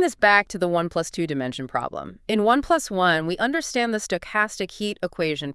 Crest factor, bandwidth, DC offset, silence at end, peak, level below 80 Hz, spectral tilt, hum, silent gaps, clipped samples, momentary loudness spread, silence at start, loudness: 20 dB; 12 kHz; under 0.1%; 0 s; -4 dBFS; -52 dBFS; -4 dB/octave; none; none; under 0.1%; 10 LU; 0 s; -23 LUFS